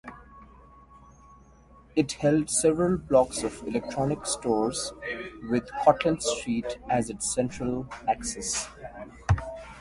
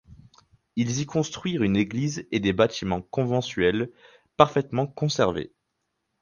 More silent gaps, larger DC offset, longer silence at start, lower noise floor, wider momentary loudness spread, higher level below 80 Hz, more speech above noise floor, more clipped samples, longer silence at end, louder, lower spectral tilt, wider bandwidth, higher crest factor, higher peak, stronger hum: neither; neither; about the same, 0.05 s vs 0.1 s; second, -54 dBFS vs -78 dBFS; first, 12 LU vs 9 LU; first, -46 dBFS vs -52 dBFS; second, 27 dB vs 54 dB; neither; second, 0 s vs 0.75 s; about the same, -27 LUFS vs -25 LUFS; about the same, -4.5 dB/octave vs -5.5 dB/octave; first, 11.5 kHz vs 10 kHz; about the same, 24 dB vs 26 dB; second, -4 dBFS vs 0 dBFS; neither